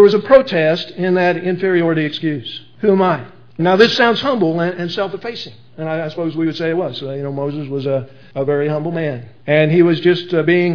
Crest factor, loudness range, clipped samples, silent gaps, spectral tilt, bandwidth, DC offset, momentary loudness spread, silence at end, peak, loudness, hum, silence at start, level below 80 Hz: 16 dB; 6 LU; under 0.1%; none; -7 dB/octave; 5.4 kHz; 0.7%; 13 LU; 0 s; 0 dBFS; -16 LUFS; none; 0 s; -56 dBFS